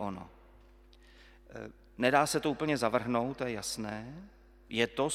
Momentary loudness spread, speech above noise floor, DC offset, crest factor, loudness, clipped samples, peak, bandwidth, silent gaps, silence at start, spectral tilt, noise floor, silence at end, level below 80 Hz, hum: 21 LU; 26 dB; under 0.1%; 24 dB; -32 LUFS; under 0.1%; -10 dBFS; 16 kHz; none; 0 s; -4 dB/octave; -58 dBFS; 0 s; -60 dBFS; none